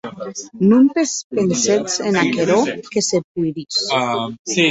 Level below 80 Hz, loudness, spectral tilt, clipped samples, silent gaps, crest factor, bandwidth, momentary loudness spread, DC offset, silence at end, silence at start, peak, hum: -60 dBFS; -17 LUFS; -4 dB/octave; under 0.1%; 1.24-1.30 s, 3.24-3.35 s, 4.39-4.45 s; 16 dB; 8.2 kHz; 10 LU; under 0.1%; 0 s; 0.05 s; -2 dBFS; none